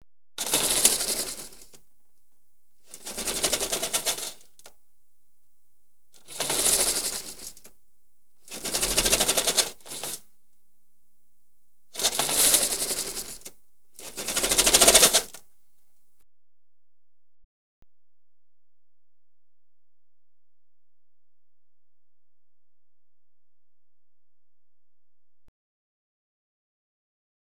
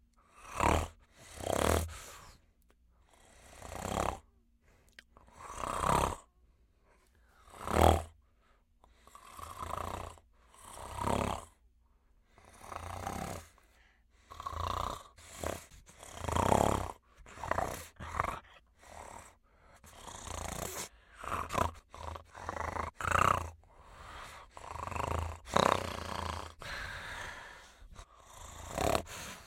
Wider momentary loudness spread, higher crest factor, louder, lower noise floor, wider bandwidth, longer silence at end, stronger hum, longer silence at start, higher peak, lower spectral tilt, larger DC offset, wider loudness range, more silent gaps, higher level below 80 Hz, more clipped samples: about the same, 22 LU vs 23 LU; about the same, 30 dB vs 30 dB; first, -22 LUFS vs -36 LUFS; first, under -90 dBFS vs -68 dBFS; first, over 20 kHz vs 16.5 kHz; first, 12.1 s vs 0 s; neither; about the same, 0.4 s vs 0.35 s; first, -2 dBFS vs -8 dBFS; second, 0 dB/octave vs -4.5 dB/octave; first, 0.5% vs under 0.1%; about the same, 9 LU vs 8 LU; neither; about the same, -52 dBFS vs -50 dBFS; neither